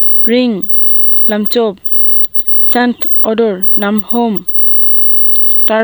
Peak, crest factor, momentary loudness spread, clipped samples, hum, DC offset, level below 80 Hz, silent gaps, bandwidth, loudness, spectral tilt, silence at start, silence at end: 0 dBFS; 8 dB; 8 LU; under 0.1%; none; under 0.1%; -54 dBFS; none; over 20 kHz; -6 LUFS; -6 dB/octave; 0 s; 0 s